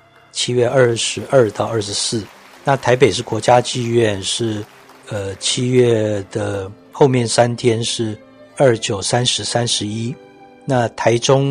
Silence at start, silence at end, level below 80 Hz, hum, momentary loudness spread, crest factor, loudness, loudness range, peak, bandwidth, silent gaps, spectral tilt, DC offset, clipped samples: 0.35 s; 0 s; -54 dBFS; none; 13 LU; 18 dB; -17 LUFS; 2 LU; 0 dBFS; 11 kHz; none; -4.5 dB/octave; under 0.1%; under 0.1%